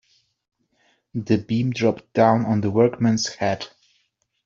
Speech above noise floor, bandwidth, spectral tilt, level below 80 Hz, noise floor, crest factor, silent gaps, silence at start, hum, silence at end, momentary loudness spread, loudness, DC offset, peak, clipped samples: 49 dB; 7.6 kHz; -6 dB/octave; -60 dBFS; -69 dBFS; 20 dB; none; 1.15 s; none; 0.8 s; 13 LU; -21 LUFS; under 0.1%; -2 dBFS; under 0.1%